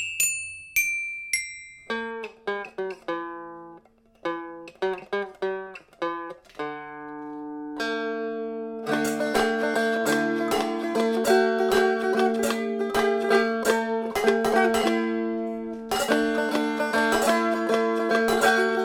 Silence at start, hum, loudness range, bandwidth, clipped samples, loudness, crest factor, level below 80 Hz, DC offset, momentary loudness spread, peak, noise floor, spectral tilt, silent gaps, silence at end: 0 s; none; 10 LU; 18 kHz; under 0.1%; -25 LUFS; 20 dB; -60 dBFS; under 0.1%; 14 LU; -6 dBFS; -54 dBFS; -3 dB/octave; none; 0 s